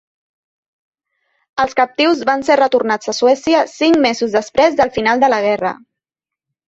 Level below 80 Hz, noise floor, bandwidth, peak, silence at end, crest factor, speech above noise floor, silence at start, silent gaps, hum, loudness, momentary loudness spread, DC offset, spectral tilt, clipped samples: -54 dBFS; -86 dBFS; 8 kHz; -2 dBFS; 0.95 s; 14 dB; 72 dB; 1.55 s; none; none; -14 LUFS; 6 LU; under 0.1%; -3.5 dB/octave; under 0.1%